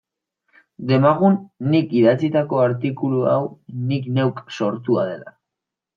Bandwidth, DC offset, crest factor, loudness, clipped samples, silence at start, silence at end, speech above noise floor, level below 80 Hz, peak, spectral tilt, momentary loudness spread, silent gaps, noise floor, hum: 7 kHz; under 0.1%; 18 dB; -20 LUFS; under 0.1%; 0.8 s; 0.65 s; 66 dB; -66 dBFS; -2 dBFS; -8.5 dB/octave; 10 LU; none; -84 dBFS; none